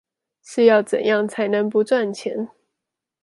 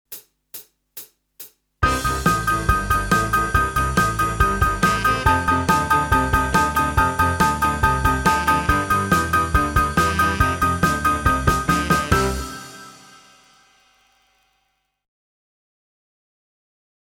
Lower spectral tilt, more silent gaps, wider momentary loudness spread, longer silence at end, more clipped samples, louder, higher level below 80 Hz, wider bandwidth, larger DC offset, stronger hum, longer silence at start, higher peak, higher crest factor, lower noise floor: about the same, -5 dB/octave vs -4.5 dB/octave; neither; second, 14 LU vs 17 LU; second, 0.75 s vs 4.15 s; neither; about the same, -20 LUFS vs -19 LUFS; second, -74 dBFS vs -30 dBFS; second, 11.5 kHz vs over 20 kHz; neither; neither; first, 0.5 s vs 0.1 s; about the same, -2 dBFS vs -2 dBFS; about the same, 18 dB vs 20 dB; first, -83 dBFS vs -70 dBFS